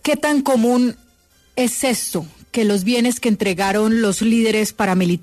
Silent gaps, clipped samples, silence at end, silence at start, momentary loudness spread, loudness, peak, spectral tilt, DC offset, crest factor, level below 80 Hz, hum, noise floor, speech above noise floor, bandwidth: none; under 0.1%; 0 s; 0.05 s; 6 LU; -18 LUFS; -6 dBFS; -4.5 dB/octave; under 0.1%; 12 dB; -52 dBFS; none; -55 dBFS; 38 dB; 14 kHz